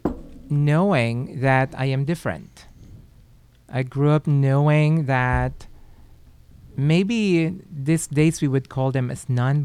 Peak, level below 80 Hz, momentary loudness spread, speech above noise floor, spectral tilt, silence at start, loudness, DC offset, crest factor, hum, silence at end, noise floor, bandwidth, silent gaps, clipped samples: -6 dBFS; -42 dBFS; 11 LU; 31 dB; -7 dB/octave; 0.05 s; -21 LUFS; under 0.1%; 16 dB; none; 0 s; -51 dBFS; 12.5 kHz; none; under 0.1%